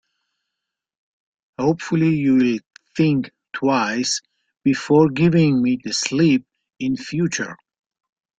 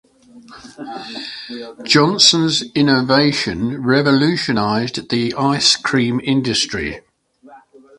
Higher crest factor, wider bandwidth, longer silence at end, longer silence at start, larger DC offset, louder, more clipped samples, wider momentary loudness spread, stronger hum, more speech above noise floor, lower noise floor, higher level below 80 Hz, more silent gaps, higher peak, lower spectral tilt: about the same, 18 dB vs 18 dB; second, 9.2 kHz vs 11.5 kHz; first, 0.85 s vs 0.4 s; first, 1.6 s vs 0.35 s; neither; second, -19 LUFS vs -15 LUFS; neither; second, 11 LU vs 18 LU; neither; first, 64 dB vs 31 dB; first, -82 dBFS vs -47 dBFS; second, -56 dBFS vs -48 dBFS; first, 2.66-2.71 s vs none; second, -4 dBFS vs 0 dBFS; first, -5.5 dB/octave vs -4 dB/octave